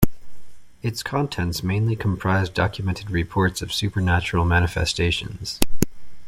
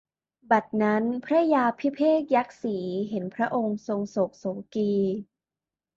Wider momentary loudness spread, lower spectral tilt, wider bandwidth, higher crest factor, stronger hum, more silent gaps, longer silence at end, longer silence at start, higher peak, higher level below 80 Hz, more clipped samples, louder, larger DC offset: about the same, 7 LU vs 9 LU; second, -5 dB/octave vs -7.5 dB/octave; first, 16.5 kHz vs 7.4 kHz; about the same, 22 dB vs 18 dB; neither; neither; second, 0 s vs 0.75 s; second, 0 s vs 0.5 s; first, 0 dBFS vs -8 dBFS; first, -38 dBFS vs -70 dBFS; neither; first, -23 LUFS vs -26 LUFS; neither